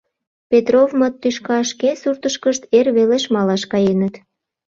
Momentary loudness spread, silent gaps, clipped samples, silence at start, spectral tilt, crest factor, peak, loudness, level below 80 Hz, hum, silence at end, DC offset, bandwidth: 7 LU; none; under 0.1%; 0.5 s; -5 dB/octave; 16 dB; -2 dBFS; -17 LUFS; -60 dBFS; none; 0.5 s; under 0.1%; 7.8 kHz